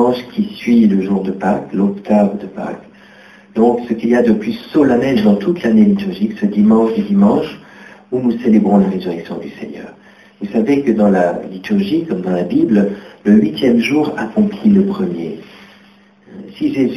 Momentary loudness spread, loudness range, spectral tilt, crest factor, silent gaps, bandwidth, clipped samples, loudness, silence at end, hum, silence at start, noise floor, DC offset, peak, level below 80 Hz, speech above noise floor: 14 LU; 4 LU; -8 dB/octave; 14 dB; none; 6.6 kHz; under 0.1%; -14 LUFS; 0 s; none; 0 s; -47 dBFS; under 0.1%; 0 dBFS; -50 dBFS; 33 dB